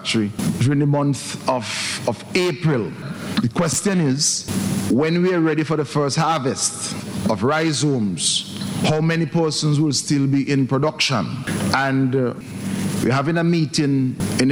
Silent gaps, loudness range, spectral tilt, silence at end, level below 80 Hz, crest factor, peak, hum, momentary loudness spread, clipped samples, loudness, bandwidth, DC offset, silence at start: none; 2 LU; -4.5 dB/octave; 0 s; -52 dBFS; 18 dB; -2 dBFS; none; 6 LU; under 0.1%; -20 LUFS; over 20 kHz; under 0.1%; 0 s